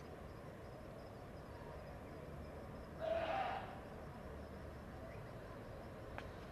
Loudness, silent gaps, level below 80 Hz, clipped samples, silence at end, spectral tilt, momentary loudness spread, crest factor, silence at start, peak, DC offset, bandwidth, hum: -49 LUFS; none; -60 dBFS; under 0.1%; 0 s; -6.5 dB/octave; 12 LU; 18 dB; 0 s; -30 dBFS; under 0.1%; 13 kHz; none